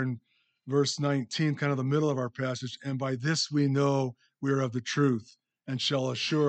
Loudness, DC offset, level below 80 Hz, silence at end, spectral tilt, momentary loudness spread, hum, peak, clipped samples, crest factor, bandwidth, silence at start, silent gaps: -29 LUFS; under 0.1%; -76 dBFS; 0 s; -5.5 dB/octave; 9 LU; none; -14 dBFS; under 0.1%; 16 dB; 9 kHz; 0 s; none